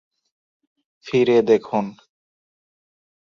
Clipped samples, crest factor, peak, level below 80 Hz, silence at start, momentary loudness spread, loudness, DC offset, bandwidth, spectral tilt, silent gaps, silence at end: under 0.1%; 18 dB; -4 dBFS; -66 dBFS; 1.05 s; 9 LU; -19 LUFS; under 0.1%; 7.2 kHz; -6.5 dB/octave; none; 1.35 s